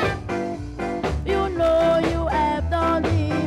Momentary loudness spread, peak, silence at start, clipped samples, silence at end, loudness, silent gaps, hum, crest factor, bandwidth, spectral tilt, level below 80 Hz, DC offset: 9 LU; -10 dBFS; 0 s; under 0.1%; 0 s; -22 LUFS; none; none; 12 dB; 12.5 kHz; -7 dB/octave; -32 dBFS; under 0.1%